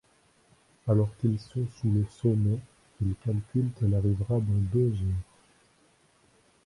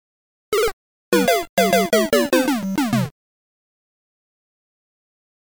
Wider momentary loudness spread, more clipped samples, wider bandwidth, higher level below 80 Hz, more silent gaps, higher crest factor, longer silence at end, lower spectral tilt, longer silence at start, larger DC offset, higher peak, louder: about the same, 8 LU vs 7 LU; neither; second, 11 kHz vs over 20 kHz; first, -46 dBFS vs -52 dBFS; second, none vs 0.73-1.12 s, 1.49-1.57 s; about the same, 16 dB vs 16 dB; second, 1.4 s vs 2.5 s; first, -10 dB/octave vs -4.5 dB/octave; first, 0.85 s vs 0.5 s; second, under 0.1% vs 0.3%; second, -12 dBFS vs -6 dBFS; second, -29 LUFS vs -19 LUFS